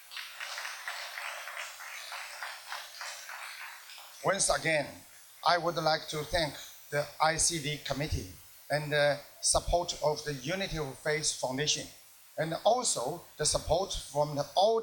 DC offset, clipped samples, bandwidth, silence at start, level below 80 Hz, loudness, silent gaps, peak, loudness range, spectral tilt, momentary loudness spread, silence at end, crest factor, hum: under 0.1%; under 0.1%; 19 kHz; 0 s; -50 dBFS; -32 LUFS; none; -12 dBFS; 9 LU; -2.5 dB/octave; 14 LU; 0 s; 22 dB; none